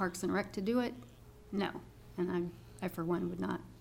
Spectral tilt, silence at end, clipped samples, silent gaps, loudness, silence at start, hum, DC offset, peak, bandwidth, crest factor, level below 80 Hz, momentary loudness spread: -6 dB/octave; 0 s; under 0.1%; none; -37 LUFS; 0 s; none; under 0.1%; -22 dBFS; 16 kHz; 16 dB; -62 dBFS; 13 LU